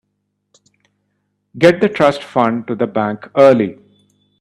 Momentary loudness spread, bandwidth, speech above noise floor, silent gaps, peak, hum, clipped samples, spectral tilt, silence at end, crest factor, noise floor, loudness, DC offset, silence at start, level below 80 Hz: 9 LU; 11 kHz; 57 dB; none; 0 dBFS; 50 Hz at -45 dBFS; under 0.1%; -6.5 dB/octave; 0.7 s; 16 dB; -70 dBFS; -14 LUFS; under 0.1%; 1.55 s; -58 dBFS